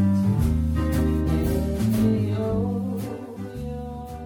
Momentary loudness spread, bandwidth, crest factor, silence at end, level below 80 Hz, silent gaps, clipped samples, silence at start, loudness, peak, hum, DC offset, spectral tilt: 12 LU; 19.5 kHz; 14 dB; 0 s; -32 dBFS; none; under 0.1%; 0 s; -24 LUFS; -10 dBFS; none; under 0.1%; -8 dB/octave